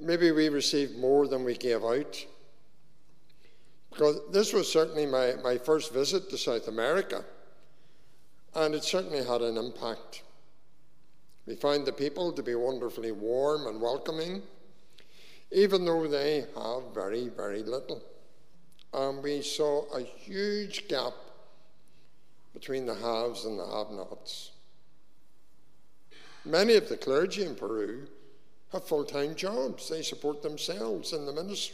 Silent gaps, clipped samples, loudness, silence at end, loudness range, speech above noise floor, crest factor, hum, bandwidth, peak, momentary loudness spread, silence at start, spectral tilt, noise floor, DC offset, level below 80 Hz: none; under 0.1%; -30 LUFS; 0 s; 8 LU; 40 dB; 20 dB; none; 15.5 kHz; -10 dBFS; 14 LU; 0 s; -4 dB/octave; -70 dBFS; 0.6%; -74 dBFS